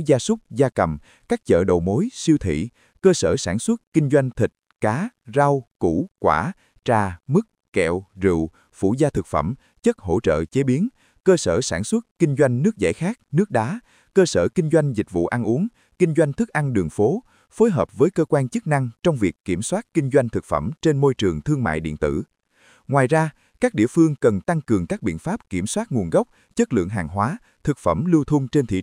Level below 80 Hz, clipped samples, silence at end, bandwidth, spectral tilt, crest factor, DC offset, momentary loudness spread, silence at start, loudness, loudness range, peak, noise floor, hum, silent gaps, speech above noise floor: -48 dBFS; under 0.1%; 0 s; 15.5 kHz; -6.5 dB/octave; 18 dB; under 0.1%; 7 LU; 0 s; -21 LUFS; 2 LU; -2 dBFS; -57 dBFS; none; 3.87-3.92 s, 5.67-5.75 s, 6.11-6.15 s, 7.68-7.72 s, 12.11-12.16 s, 19.40-19.44 s; 36 dB